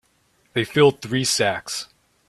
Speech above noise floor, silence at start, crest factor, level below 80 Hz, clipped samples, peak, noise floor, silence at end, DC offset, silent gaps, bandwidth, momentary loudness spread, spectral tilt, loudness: 43 dB; 0.55 s; 20 dB; -60 dBFS; under 0.1%; -2 dBFS; -63 dBFS; 0.45 s; under 0.1%; none; 13.5 kHz; 13 LU; -3.5 dB/octave; -21 LUFS